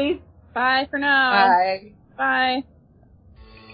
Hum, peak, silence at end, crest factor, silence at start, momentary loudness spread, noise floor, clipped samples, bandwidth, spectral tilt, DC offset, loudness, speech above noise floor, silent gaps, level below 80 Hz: none; -4 dBFS; 0.3 s; 18 dB; 0 s; 14 LU; -52 dBFS; under 0.1%; 5.2 kHz; -8 dB/octave; under 0.1%; -19 LUFS; 33 dB; none; -54 dBFS